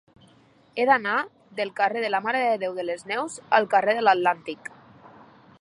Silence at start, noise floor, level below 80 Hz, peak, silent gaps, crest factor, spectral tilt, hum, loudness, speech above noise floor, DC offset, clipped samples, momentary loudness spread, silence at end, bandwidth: 0.75 s; -57 dBFS; -76 dBFS; -4 dBFS; none; 22 dB; -3.5 dB/octave; none; -24 LUFS; 34 dB; under 0.1%; under 0.1%; 14 LU; 1.05 s; 11.5 kHz